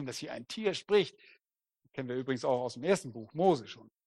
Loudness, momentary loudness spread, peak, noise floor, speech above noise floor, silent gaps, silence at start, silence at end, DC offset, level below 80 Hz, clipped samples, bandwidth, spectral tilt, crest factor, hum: -33 LUFS; 13 LU; -14 dBFS; -77 dBFS; 44 dB; none; 0 s; 0.25 s; under 0.1%; -76 dBFS; under 0.1%; 12.5 kHz; -5 dB/octave; 20 dB; none